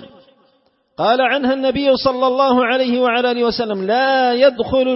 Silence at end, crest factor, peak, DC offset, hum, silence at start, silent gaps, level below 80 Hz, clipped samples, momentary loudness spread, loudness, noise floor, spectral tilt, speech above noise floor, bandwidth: 0 s; 14 dB; -2 dBFS; under 0.1%; none; 0 s; none; -50 dBFS; under 0.1%; 4 LU; -16 LUFS; -60 dBFS; -8 dB/octave; 44 dB; 5.8 kHz